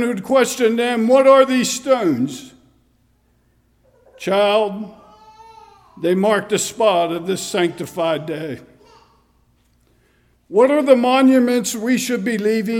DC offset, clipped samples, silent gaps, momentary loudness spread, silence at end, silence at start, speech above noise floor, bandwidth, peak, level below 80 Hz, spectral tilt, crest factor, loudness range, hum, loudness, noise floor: under 0.1%; under 0.1%; none; 12 LU; 0 s; 0 s; 43 dB; 17 kHz; 0 dBFS; -62 dBFS; -4.5 dB/octave; 18 dB; 7 LU; none; -17 LUFS; -59 dBFS